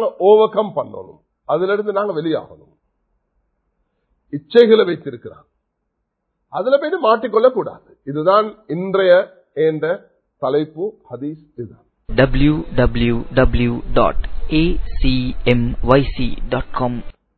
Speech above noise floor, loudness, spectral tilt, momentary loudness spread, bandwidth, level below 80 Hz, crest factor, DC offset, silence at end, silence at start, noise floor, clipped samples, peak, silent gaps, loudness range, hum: 57 dB; -17 LUFS; -9.5 dB/octave; 17 LU; 4.5 kHz; -30 dBFS; 18 dB; under 0.1%; 0.25 s; 0 s; -73 dBFS; under 0.1%; 0 dBFS; none; 5 LU; none